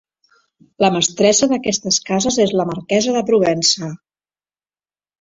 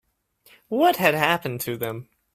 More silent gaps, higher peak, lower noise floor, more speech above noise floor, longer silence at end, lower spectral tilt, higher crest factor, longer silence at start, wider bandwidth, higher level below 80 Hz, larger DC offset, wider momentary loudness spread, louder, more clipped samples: neither; about the same, -2 dBFS vs -2 dBFS; first, under -90 dBFS vs -60 dBFS; first, over 74 dB vs 37 dB; first, 1.25 s vs 0.3 s; about the same, -3.5 dB/octave vs -4.5 dB/octave; second, 16 dB vs 22 dB; about the same, 0.8 s vs 0.7 s; second, 8 kHz vs 16 kHz; first, -56 dBFS vs -64 dBFS; neither; second, 5 LU vs 12 LU; first, -16 LUFS vs -22 LUFS; neither